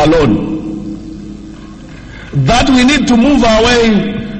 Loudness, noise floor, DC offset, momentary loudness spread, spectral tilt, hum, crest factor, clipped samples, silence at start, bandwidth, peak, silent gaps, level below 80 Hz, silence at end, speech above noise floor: -10 LUFS; -30 dBFS; under 0.1%; 22 LU; -5 dB/octave; none; 10 dB; under 0.1%; 0 s; 8.8 kHz; 0 dBFS; none; -26 dBFS; 0 s; 21 dB